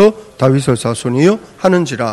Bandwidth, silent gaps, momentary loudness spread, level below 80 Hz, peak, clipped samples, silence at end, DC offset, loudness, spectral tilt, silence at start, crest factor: 12.5 kHz; none; 4 LU; -46 dBFS; 0 dBFS; 0.7%; 0 s; under 0.1%; -14 LUFS; -6.5 dB/octave; 0 s; 12 dB